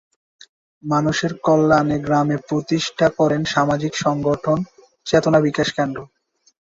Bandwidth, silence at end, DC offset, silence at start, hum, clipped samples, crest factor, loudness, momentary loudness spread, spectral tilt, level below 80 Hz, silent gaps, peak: 7.8 kHz; 0.6 s; under 0.1%; 0.85 s; none; under 0.1%; 18 dB; -19 LUFS; 8 LU; -5.5 dB/octave; -50 dBFS; none; -2 dBFS